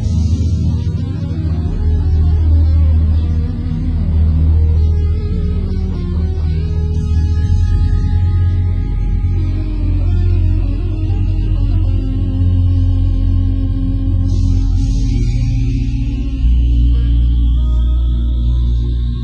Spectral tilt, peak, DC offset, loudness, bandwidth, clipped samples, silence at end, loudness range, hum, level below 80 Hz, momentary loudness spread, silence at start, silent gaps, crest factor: -9 dB/octave; -2 dBFS; under 0.1%; -16 LUFS; 6.8 kHz; under 0.1%; 0 s; 2 LU; none; -16 dBFS; 6 LU; 0 s; none; 10 dB